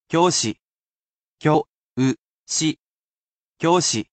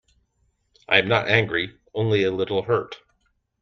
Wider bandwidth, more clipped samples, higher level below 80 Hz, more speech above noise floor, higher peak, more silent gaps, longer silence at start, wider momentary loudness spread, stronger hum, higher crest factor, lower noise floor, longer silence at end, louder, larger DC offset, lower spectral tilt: first, 9 kHz vs 6.8 kHz; neither; second, -64 dBFS vs -58 dBFS; first, over 71 dB vs 48 dB; about the same, -4 dBFS vs -2 dBFS; first, 0.63-1.37 s, 1.69-1.79 s, 1.85-1.96 s, 2.21-2.46 s, 2.80-3.53 s vs none; second, 0.1 s vs 0.9 s; first, 14 LU vs 11 LU; neither; about the same, 18 dB vs 22 dB; first, under -90 dBFS vs -69 dBFS; second, 0.1 s vs 0.65 s; about the same, -21 LUFS vs -22 LUFS; neither; second, -4 dB/octave vs -6.5 dB/octave